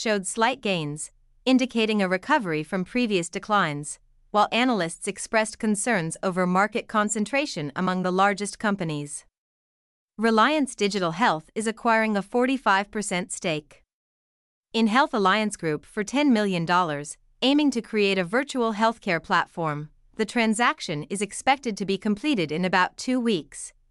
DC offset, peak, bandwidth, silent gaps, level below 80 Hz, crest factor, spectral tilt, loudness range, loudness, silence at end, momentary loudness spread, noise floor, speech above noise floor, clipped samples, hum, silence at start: under 0.1%; -8 dBFS; 12 kHz; 9.38-10.08 s, 13.93-14.63 s; -60 dBFS; 18 dB; -4 dB/octave; 2 LU; -24 LUFS; 0.2 s; 9 LU; under -90 dBFS; over 66 dB; under 0.1%; none; 0 s